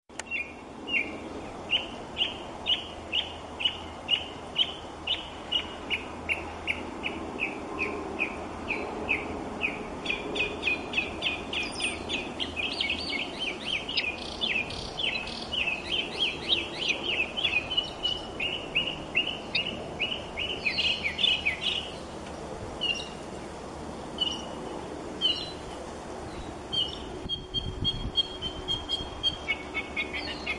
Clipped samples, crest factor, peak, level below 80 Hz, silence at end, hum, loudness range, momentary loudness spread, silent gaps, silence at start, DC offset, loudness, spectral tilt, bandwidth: under 0.1%; 22 dB; -10 dBFS; -50 dBFS; 0 s; none; 4 LU; 11 LU; none; 0.1 s; under 0.1%; -30 LUFS; -3 dB/octave; 11.5 kHz